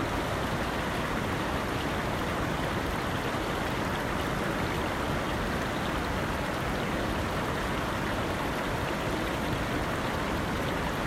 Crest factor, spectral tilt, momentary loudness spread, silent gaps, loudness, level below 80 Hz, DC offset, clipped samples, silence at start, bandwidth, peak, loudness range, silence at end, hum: 12 dB; -5 dB/octave; 0 LU; none; -30 LUFS; -40 dBFS; under 0.1%; under 0.1%; 0 s; 16 kHz; -18 dBFS; 0 LU; 0 s; none